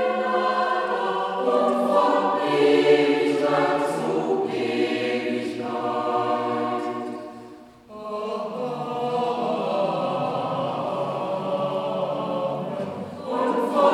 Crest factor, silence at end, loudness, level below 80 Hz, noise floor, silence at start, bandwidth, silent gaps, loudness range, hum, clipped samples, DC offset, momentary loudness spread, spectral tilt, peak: 16 dB; 0 s; -24 LUFS; -70 dBFS; -44 dBFS; 0 s; 13 kHz; none; 7 LU; none; under 0.1%; under 0.1%; 10 LU; -6 dB/octave; -6 dBFS